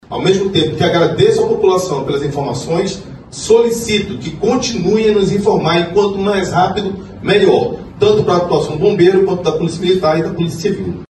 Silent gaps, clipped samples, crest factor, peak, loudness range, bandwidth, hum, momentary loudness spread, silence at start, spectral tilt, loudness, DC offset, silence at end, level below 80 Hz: none; under 0.1%; 14 dB; 0 dBFS; 2 LU; 12.5 kHz; none; 8 LU; 0.1 s; -5.5 dB/octave; -14 LUFS; under 0.1%; 0.1 s; -40 dBFS